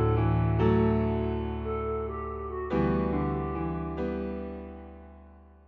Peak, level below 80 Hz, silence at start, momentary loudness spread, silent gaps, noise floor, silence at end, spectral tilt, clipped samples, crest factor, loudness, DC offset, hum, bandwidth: -12 dBFS; -38 dBFS; 0 s; 15 LU; none; -52 dBFS; 0.25 s; -10.5 dB/octave; under 0.1%; 16 dB; -29 LUFS; under 0.1%; none; 4.6 kHz